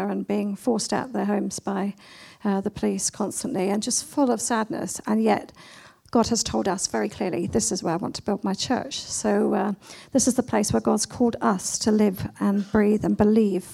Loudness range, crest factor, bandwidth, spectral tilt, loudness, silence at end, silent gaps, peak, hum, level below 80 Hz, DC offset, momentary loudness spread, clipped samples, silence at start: 4 LU; 18 dB; 15 kHz; -4.5 dB/octave; -24 LUFS; 0 s; none; -6 dBFS; none; -52 dBFS; under 0.1%; 7 LU; under 0.1%; 0 s